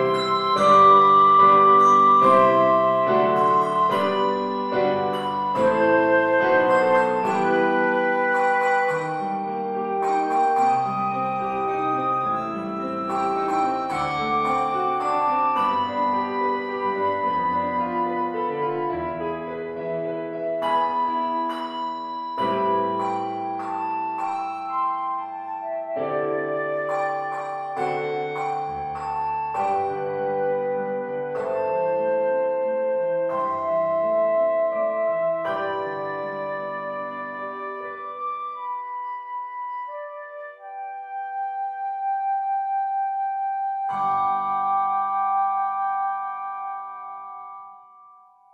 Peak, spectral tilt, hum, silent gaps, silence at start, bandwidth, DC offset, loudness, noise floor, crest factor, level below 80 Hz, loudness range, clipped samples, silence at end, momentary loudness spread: -4 dBFS; -6 dB/octave; none; none; 0 s; 11.5 kHz; under 0.1%; -22 LUFS; -51 dBFS; 18 dB; -62 dBFS; 9 LU; under 0.1%; 0.7 s; 13 LU